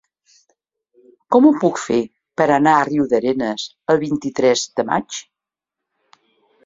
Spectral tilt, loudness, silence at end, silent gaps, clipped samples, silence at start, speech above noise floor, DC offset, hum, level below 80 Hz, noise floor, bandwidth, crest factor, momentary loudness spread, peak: -5 dB/octave; -17 LUFS; 1.45 s; none; under 0.1%; 1.3 s; 68 dB; under 0.1%; none; -60 dBFS; -85 dBFS; 7.8 kHz; 18 dB; 10 LU; -2 dBFS